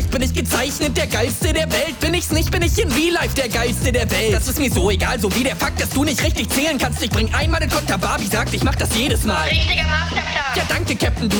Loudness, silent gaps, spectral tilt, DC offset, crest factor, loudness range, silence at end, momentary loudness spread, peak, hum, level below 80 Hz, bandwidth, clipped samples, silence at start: -18 LUFS; none; -4 dB/octave; under 0.1%; 12 dB; 1 LU; 0 s; 3 LU; -6 dBFS; none; -26 dBFS; over 20 kHz; under 0.1%; 0 s